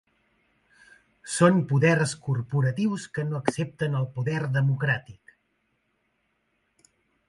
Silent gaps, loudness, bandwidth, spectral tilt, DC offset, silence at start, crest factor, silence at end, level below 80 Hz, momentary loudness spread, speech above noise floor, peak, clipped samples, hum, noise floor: none; -25 LUFS; 11.5 kHz; -6 dB/octave; under 0.1%; 1.25 s; 22 dB; 2.15 s; -64 dBFS; 9 LU; 49 dB; -6 dBFS; under 0.1%; none; -73 dBFS